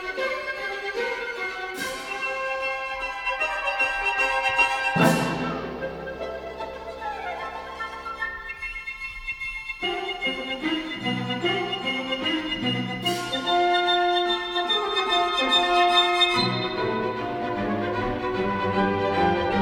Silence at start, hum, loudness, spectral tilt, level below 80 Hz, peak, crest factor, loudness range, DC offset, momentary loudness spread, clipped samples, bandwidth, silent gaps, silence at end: 0 s; none; -25 LUFS; -4 dB/octave; -50 dBFS; -6 dBFS; 20 dB; 10 LU; under 0.1%; 12 LU; under 0.1%; 17.5 kHz; none; 0 s